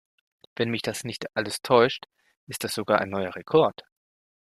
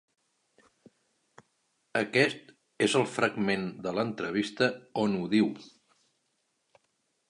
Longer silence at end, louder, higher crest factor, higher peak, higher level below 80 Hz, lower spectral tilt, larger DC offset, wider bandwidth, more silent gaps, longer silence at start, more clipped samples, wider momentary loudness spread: second, 0.7 s vs 1.6 s; first, -25 LUFS vs -29 LUFS; about the same, 22 dB vs 22 dB; first, -4 dBFS vs -10 dBFS; first, -66 dBFS vs -72 dBFS; about the same, -4.5 dB/octave vs -5 dB/octave; neither; first, 14.5 kHz vs 11.5 kHz; first, 2.37-2.47 s vs none; second, 0.6 s vs 1.95 s; neither; first, 13 LU vs 6 LU